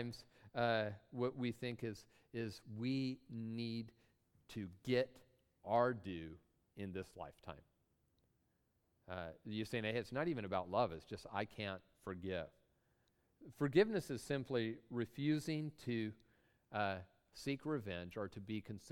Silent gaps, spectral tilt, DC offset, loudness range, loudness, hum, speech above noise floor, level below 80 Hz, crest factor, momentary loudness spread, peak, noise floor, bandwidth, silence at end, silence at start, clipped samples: none; -6.5 dB/octave; under 0.1%; 6 LU; -42 LUFS; none; 39 dB; -72 dBFS; 24 dB; 14 LU; -20 dBFS; -81 dBFS; 18 kHz; 0 s; 0 s; under 0.1%